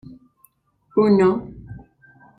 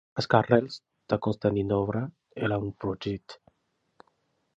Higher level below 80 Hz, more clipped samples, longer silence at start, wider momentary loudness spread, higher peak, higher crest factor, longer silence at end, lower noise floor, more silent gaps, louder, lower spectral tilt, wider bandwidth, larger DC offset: about the same, -52 dBFS vs -56 dBFS; neither; first, 0.95 s vs 0.15 s; first, 26 LU vs 15 LU; about the same, -6 dBFS vs -4 dBFS; second, 18 dB vs 26 dB; second, 0.6 s vs 1.2 s; second, -60 dBFS vs -75 dBFS; neither; first, -18 LUFS vs -28 LUFS; about the same, -8.5 dB/octave vs -7.5 dB/octave; about the same, 8.2 kHz vs 8 kHz; neither